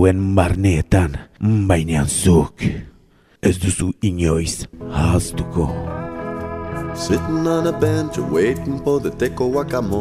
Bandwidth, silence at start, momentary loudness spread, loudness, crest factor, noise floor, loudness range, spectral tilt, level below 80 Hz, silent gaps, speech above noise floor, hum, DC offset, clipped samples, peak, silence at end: 15 kHz; 0 s; 11 LU; -19 LUFS; 18 dB; -52 dBFS; 4 LU; -6 dB/octave; -32 dBFS; none; 34 dB; none; under 0.1%; under 0.1%; -2 dBFS; 0 s